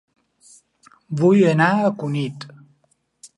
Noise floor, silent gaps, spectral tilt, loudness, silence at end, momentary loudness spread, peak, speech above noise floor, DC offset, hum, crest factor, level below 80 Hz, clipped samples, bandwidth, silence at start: -65 dBFS; none; -7.5 dB/octave; -18 LUFS; 0.1 s; 19 LU; -2 dBFS; 48 dB; under 0.1%; none; 18 dB; -66 dBFS; under 0.1%; 11 kHz; 1.1 s